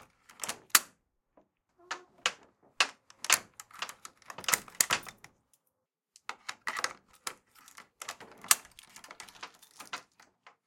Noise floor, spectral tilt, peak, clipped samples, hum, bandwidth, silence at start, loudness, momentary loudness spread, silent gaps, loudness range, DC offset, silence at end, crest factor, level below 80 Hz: -82 dBFS; 1.5 dB/octave; -2 dBFS; under 0.1%; none; 16.5 kHz; 0.4 s; -31 LUFS; 22 LU; none; 5 LU; under 0.1%; 0.65 s; 36 dB; -78 dBFS